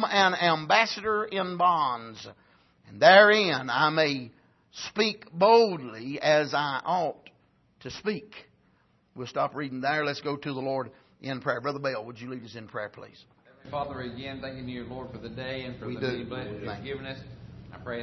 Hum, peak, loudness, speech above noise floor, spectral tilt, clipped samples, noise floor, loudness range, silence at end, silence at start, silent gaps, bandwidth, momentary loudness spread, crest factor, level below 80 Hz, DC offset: none; -4 dBFS; -26 LUFS; 39 dB; -4.5 dB/octave; under 0.1%; -66 dBFS; 14 LU; 0 s; 0 s; none; 6.2 kHz; 19 LU; 24 dB; -62 dBFS; under 0.1%